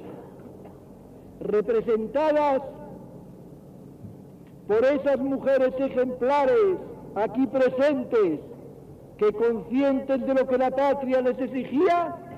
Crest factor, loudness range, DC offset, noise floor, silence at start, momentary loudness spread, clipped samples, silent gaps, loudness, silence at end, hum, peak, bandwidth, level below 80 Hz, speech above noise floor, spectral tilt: 12 dB; 4 LU; under 0.1%; -46 dBFS; 0 s; 22 LU; under 0.1%; none; -24 LUFS; 0 s; none; -14 dBFS; 8.4 kHz; -58 dBFS; 23 dB; -7.5 dB/octave